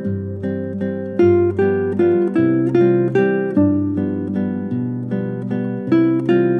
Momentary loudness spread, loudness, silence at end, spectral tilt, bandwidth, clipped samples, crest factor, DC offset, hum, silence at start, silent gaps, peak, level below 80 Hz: 9 LU; -18 LUFS; 0 s; -10 dB/octave; 4.6 kHz; under 0.1%; 14 dB; under 0.1%; none; 0 s; none; -4 dBFS; -64 dBFS